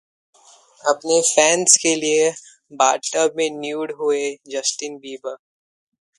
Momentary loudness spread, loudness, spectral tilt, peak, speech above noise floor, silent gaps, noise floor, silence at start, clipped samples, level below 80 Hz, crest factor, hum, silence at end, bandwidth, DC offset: 18 LU; -18 LUFS; -1 dB/octave; 0 dBFS; 32 dB; none; -51 dBFS; 0.85 s; under 0.1%; -72 dBFS; 20 dB; none; 0.8 s; 13.5 kHz; under 0.1%